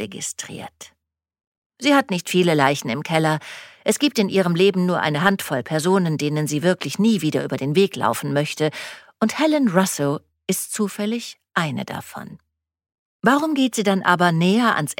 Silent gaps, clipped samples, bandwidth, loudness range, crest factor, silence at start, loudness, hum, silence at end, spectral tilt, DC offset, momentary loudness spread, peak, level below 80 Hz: 1.47-1.70 s, 12.99-13.19 s; under 0.1%; 17 kHz; 4 LU; 20 dB; 0 s; -20 LUFS; none; 0.05 s; -5 dB/octave; under 0.1%; 12 LU; -2 dBFS; -66 dBFS